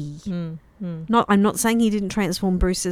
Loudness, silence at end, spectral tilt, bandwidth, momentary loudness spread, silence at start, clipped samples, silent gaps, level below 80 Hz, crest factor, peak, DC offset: -21 LUFS; 0 s; -5 dB/octave; 16 kHz; 14 LU; 0 s; under 0.1%; none; -36 dBFS; 18 dB; -4 dBFS; under 0.1%